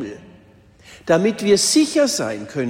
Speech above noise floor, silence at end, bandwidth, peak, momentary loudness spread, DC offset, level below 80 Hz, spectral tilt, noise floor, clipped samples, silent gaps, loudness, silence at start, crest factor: 32 dB; 0 s; 16.5 kHz; -4 dBFS; 14 LU; under 0.1%; -58 dBFS; -3.5 dB/octave; -49 dBFS; under 0.1%; none; -17 LUFS; 0 s; 16 dB